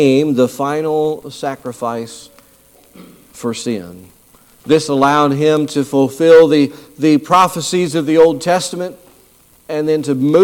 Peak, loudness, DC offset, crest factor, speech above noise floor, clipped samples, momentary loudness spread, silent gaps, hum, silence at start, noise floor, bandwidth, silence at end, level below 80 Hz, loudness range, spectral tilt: 0 dBFS; -14 LUFS; under 0.1%; 14 dB; 35 dB; under 0.1%; 14 LU; none; none; 0 s; -49 dBFS; 17 kHz; 0 s; -56 dBFS; 11 LU; -5.5 dB/octave